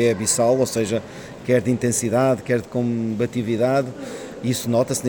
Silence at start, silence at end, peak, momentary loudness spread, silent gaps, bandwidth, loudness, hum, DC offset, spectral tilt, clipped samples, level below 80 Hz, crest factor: 0 s; 0 s; -6 dBFS; 10 LU; none; 19.5 kHz; -21 LUFS; none; under 0.1%; -5 dB/octave; under 0.1%; -56 dBFS; 16 dB